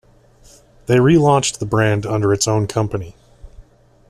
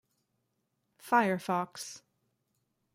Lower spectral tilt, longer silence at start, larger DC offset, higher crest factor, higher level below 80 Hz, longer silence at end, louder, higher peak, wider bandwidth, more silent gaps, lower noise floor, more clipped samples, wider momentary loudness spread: about the same, -5.5 dB/octave vs -5 dB/octave; second, 0.9 s vs 1.05 s; neither; second, 16 dB vs 22 dB; first, -44 dBFS vs -80 dBFS; second, 0.5 s vs 0.95 s; first, -16 LUFS vs -30 LUFS; first, -2 dBFS vs -14 dBFS; second, 14 kHz vs 16 kHz; neither; second, -48 dBFS vs -80 dBFS; neither; second, 13 LU vs 16 LU